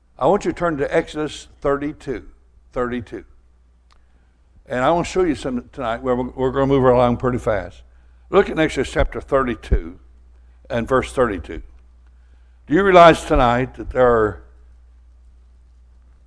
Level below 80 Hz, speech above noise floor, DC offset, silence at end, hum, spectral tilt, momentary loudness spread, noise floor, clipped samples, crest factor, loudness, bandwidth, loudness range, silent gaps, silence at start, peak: -34 dBFS; 35 dB; under 0.1%; 1.85 s; none; -6 dB/octave; 15 LU; -53 dBFS; under 0.1%; 20 dB; -19 LUFS; 11 kHz; 9 LU; none; 0.2 s; 0 dBFS